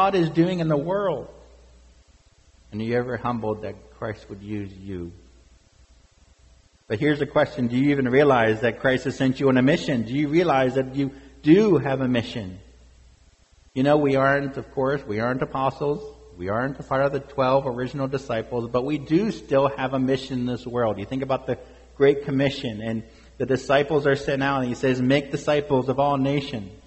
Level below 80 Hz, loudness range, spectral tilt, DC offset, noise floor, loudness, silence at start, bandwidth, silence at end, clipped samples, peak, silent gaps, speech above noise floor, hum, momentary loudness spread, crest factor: -50 dBFS; 10 LU; -7 dB/octave; under 0.1%; -56 dBFS; -23 LUFS; 0 s; 8.2 kHz; 0.1 s; under 0.1%; -4 dBFS; none; 34 dB; none; 14 LU; 20 dB